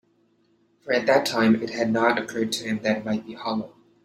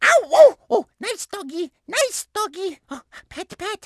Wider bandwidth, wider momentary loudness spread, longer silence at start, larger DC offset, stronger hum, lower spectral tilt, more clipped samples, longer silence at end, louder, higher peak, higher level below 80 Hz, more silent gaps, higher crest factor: first, 15.5 kHz vs 12 kHz; second, 9 LU vs 23 LU; first, 0.85 s vs 0 s; neither; neither; first, -4.5 dB/octave vs -1 dB/octave; neither; first, 0.35 s vs 0.1 s; second, -24 LUFS vs -20 LUFS; second, -6 dBFS vs 0 dBFS; about the same, -66 dBFS vs -62 dBFS; neither; about the same, 20 dB vs 20 dB